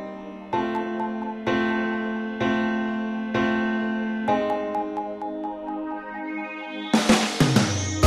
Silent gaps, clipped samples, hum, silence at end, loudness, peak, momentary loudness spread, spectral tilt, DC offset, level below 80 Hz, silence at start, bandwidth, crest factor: none; under 0.1%; none; 0 s; -25 LUFS; -6 dBFS; 12 LU; -5 dB/octave; under 0.1%; -52 dBFS; 0 s; 13.5 kHz; 20 dB